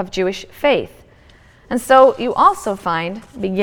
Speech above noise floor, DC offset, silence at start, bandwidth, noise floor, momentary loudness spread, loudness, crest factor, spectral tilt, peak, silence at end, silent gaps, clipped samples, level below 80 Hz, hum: 31 dB; under 0.1%; 0 s; 18 kHz; -47 dBFS; 14 LU; -16 LUFS; 18 dB; -5 dB/octave; 0 dBFS; 0 s; none; under 0.1%; -48 dBFS; none